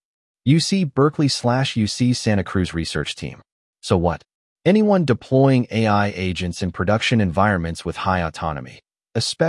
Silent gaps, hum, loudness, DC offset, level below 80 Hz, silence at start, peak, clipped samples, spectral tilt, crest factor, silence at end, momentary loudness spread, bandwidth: 3.52-3.73 s, 4.34-4.56 s; none; -20 LUFS; under 0.1%; -48 dBFS; 0.45 s; -4 dBFS; under 0.1%; -6 dB/octave; 16 dB; 0 s; 11 LU; 12 kHz